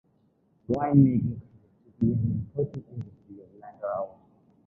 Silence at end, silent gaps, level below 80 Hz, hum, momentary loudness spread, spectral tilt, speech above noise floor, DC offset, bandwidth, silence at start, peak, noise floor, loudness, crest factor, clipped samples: 0.6 s; none; -52 dBFS; none; 21 LU; -12.5 dB/octave; 41 dB; under 0.1%; 2.9 kHz; 0.7 s; -6 dBFS; -67 dBFS; -27 LUFS; 22 dB; under 0.1%